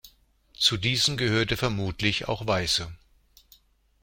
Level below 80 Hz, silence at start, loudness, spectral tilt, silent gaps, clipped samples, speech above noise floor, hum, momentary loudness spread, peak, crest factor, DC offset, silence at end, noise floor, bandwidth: -48 dBFS; 0.05 s; -25 LUFS; -3.5 dB/octave; none; under 0.1%; 34 dB; none; 5 LU; -6 dBFS; 22 dB; under 0.1%; 1.05 s; -60 dBFS; 16.5 kHz